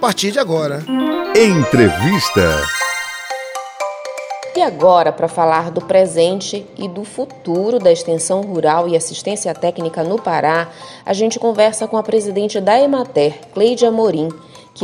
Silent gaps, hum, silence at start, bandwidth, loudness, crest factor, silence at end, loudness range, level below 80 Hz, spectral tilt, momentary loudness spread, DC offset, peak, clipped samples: none; none; 0 s; over 20 kHz; -16 LUFS; 16 dB; 0 s; 2 LU; -44 dBFS; -4.5 dB/octave; 12 LU; under 0.1%; 0 dBFS; under 0.1%